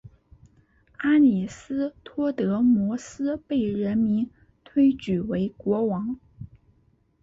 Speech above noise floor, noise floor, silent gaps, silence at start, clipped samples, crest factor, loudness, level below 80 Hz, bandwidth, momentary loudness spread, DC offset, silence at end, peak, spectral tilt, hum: 40 dB; -64 dBFS; none; 1 s; under 0.1%; 14 dB; -25 LUFS; -56 dBFS; 7.8 kHz; 12 LU; under 0.1%; 0.75 s; -10 dBFS; -7.5 dB/octave; none